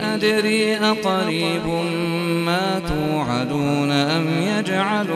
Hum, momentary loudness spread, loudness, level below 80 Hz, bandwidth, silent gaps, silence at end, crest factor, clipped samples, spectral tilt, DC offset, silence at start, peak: none; 4 LU; -20 LUFS; -46 dBFS; 14 kHz; none; 0 s; 16 dB; under 0.1%; -5.5 dB/octave; under 0.1%; 0 s; -4 dBFS